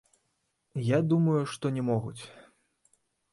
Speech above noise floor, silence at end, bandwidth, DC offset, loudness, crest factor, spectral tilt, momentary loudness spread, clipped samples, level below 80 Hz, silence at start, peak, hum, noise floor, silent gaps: 50 dB; 0.9 s; 11.5 kHz; under 0.1%; -28 LUFS; 16 dB; -7.5 dB/octave; 17 LU; under 0.1%; -66 dBFS; 0.75 s; -14 dBFS; none; -77 dBFS; none